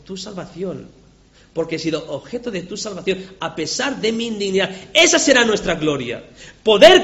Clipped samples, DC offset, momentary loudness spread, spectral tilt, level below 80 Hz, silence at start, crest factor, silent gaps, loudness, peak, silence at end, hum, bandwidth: 0.2%; under 0.1%; 17 LU; -2.5 dB/octave; -48 dBFS; 0.1 s; 18 dB; none; -18 LUFS; 0 dBFS; 0 s; none; 8.2 kHz